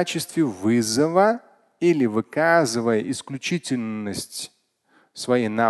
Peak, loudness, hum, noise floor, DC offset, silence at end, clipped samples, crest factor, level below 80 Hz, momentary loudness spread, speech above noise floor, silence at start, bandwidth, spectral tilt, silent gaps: -4 dBFS; -22 LUFS; none; -62 dBFS; under 0.1%; 0 s; under 0.1%; 18 dB; -62 dBFS; 12 LU; 40 dB; 0 s; 12.5 kHz; -4.5 dB/octave; none